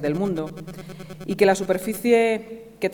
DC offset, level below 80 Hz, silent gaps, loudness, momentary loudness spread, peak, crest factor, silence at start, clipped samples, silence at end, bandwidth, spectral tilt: under 0.1%; -54 dBFS; none; -22 LUFS; 19 LU; -4 dBFS; 20 dB; 0 s; under 0.1%; 0 s; 19.5 kHz; -5.5 dB/octave